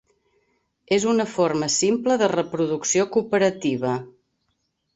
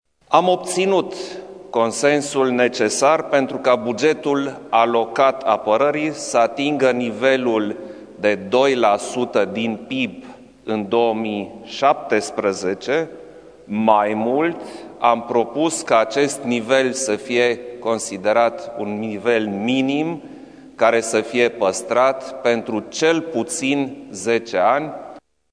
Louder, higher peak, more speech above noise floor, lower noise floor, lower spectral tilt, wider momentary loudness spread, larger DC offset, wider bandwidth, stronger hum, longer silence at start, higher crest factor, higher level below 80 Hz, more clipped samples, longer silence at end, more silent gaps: second, -22 LUFS vs -19 LUFS; second, -6 dBFS vs 0 dBFS; first, 52 dB vs 23 dB; first, -73 dBFS vs -41 dBFS; about the same, -4 dB/octave vs -4 dB/octave; second, 5 LU vs 10 LU; neither; second, 8.2 kHz vs 11 kHz; neither; first, 0.9 s vs 0.3 s; about the same, 16 dB vs 20 dB; about the same, -64 dBFS vs -64 dBFS; neither; first, 0.85 s vs 0.35 s; neither